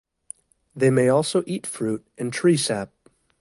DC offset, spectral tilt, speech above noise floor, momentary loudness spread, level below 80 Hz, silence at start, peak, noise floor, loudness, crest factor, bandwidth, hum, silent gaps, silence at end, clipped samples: under 0.1%; -5 dB/octave; 24 dB; 23 LU; -64 dBFS; 0.75 s; -8 dBFS; -46 dBFS; -22 LUFS; 16 dB; 11.5 kHz; none; none; 0.55 s; under 0.1%